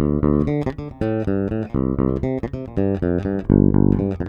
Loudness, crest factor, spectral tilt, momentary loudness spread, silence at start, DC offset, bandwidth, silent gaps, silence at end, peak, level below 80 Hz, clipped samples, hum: -20 LUFS; 18 dB; -11 dB/octave; 9 LU; 0 s; under 0.1%; 5.4 kHz; none; 0 s; 0 dBFS; -32 dBFS; under 0.1%; none